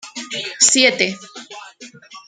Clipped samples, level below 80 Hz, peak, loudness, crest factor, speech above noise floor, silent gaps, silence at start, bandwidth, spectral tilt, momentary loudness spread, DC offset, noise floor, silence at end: under 0.1%; -68 dBFS; 0 dBFS; -15 LUFS; 20 dB; 24 dB; none; 0.05 s; 11 kHz; -0.5 dB/octave; 24 LU; under 0.1%; -41 dBFS; 0.1 s